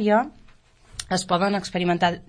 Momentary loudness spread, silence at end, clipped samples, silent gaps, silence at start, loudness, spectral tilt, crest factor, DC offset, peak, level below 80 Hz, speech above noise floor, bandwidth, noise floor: 14 LU; 0.05 s; under 0.1%; none; 0 s; -23 LUFS; -5 dB/octave; 18 dB; under 0.1%; -6 dBFS; -52 dBFS; 30 dB; 10.5 kHz; -52 dBFS